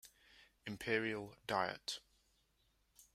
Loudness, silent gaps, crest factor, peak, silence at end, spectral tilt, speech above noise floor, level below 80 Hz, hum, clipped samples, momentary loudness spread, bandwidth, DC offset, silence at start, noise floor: -41 LUFS; none; 24 dB; -20 dBFS; 0.15 s; -4 dB/octave; 37 dB; -74 dBFS; none; under 0.1%; 13 LU; 16 kHz; under 0.1%; 0.05 s; -78 dBFS